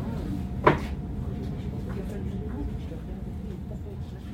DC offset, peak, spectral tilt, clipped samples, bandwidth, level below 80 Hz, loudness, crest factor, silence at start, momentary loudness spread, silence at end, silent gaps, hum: under 0.1%; -2 dBFS; -8 dB/octave; under 0.1%; 16 kHz; -38 dBFS; -31 LUFS; 28 dB; 0 s; 13 LU; 0 s; none; none